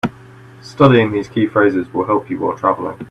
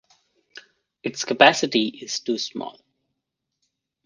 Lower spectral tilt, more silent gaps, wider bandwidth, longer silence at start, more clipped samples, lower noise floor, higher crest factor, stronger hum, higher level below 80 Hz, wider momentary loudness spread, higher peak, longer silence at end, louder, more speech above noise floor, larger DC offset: first, -8 dB/octave vs -2.5 dB/octave; neither; about the same, 10 kHz vs 10.5 kHz; second, 0.05 s vs 1.05 s; neither; second, -40 dBFS vs -81 dBFS; second, 16 dB vs 24 dB; neither; first, -52 dBFS vs -72 dBFS; second, 11 LU vs 18 LU; about the same, 0 dBFS vs 0 dBFS; second, 0.05 s vs 1.35 s; first, -16 LUFS vs -21 LUFS; second, 25 dB vs 60 dB; neither